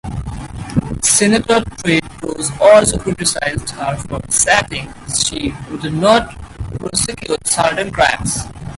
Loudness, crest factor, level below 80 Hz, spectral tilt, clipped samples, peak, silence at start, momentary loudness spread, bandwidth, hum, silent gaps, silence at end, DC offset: -15 LUFS; 16 dB; -34 dBFS; -3 dB/octave; under 0.1%; 0 dBFS; 0.05 s; 15 LU; 12 kHz; none; none; 0 s; under 0.1%